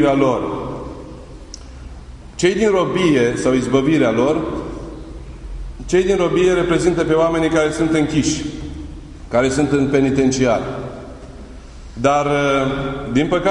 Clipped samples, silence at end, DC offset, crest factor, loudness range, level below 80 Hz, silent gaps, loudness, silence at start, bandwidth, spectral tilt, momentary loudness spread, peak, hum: under 0.1%; 0 s; under 0.1%; 16 dB; 3 LU; -36 dBFS; none; -17 LUFS; 0 s; 11 kHz; -5.5 dB/octave; 21 LU; -2 dBFS; none